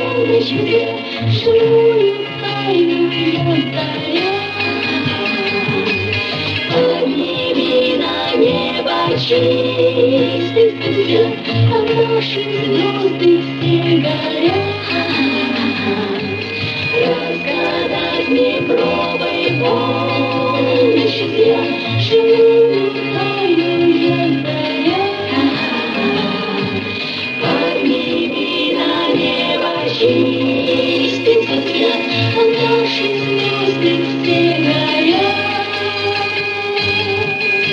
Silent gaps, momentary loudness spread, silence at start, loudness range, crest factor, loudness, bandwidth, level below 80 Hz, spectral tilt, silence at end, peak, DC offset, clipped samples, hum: none; 5 LU; 0 s; 3 LU; 14 dB; -15 LUFS; 7.8 kHz; -58 dBFS; -6.5 dB/octave; 0 s; 0 dBFS; under 0.1%; under 0.1%; none